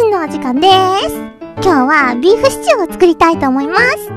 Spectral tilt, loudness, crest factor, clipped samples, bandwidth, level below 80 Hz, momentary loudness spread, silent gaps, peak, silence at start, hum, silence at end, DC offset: -4 dB/octave; -11 LUFS; 12 dB; 0.3%; 14.5 kHz; -40 dBFS; 7 LU; none; 0 dBFS; 0 s; none; 0 s; under 0.1%